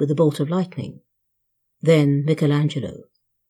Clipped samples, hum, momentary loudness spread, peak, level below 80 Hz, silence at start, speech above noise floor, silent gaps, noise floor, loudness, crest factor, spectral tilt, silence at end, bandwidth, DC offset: under 0.1%; none; 16 LU; -4 dBFS; -64 dBFS; 0 s; 54 dB; none; -73 dBFS; -20 LUFS; 16 dB; -8 dB/octave; 0.5 s; 12 kHz; under 0.1%